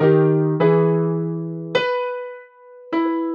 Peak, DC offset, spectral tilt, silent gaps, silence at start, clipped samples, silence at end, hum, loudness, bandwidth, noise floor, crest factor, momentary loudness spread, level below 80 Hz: -4 dBFS; under 0.1%; -9 dB/octave; none; 0 s; under 0.1%; 0 s; none; -20 LUFS; 7 kHz; -43 dBFS; 14 dB; 13 LU; -68 dBFS